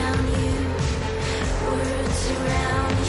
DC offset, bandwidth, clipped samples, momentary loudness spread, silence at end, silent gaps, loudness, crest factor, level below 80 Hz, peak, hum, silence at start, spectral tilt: under 0.1%; 11.5 kHz; under 0.1%; 3 LU; 0 s; none; -24 LUFS; 10 dB; -30 dBFS; -12 dBFS; none; 0 s; -5.5 dB/octave